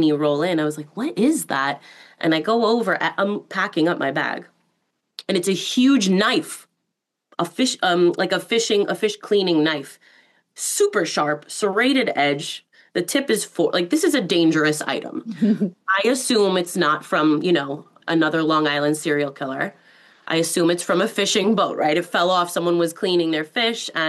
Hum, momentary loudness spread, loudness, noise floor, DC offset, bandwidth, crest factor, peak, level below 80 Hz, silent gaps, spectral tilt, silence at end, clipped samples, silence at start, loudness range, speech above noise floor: none; 9 LU; -20 LUFS; -79 dBFS; under 0.1%; 12.5 kHz; 14 dB; -6 dBFS; -74 dBFS; none; -4 dB/octave; 0 s; under 0.1%; 0 s; 2 LU; 59 dB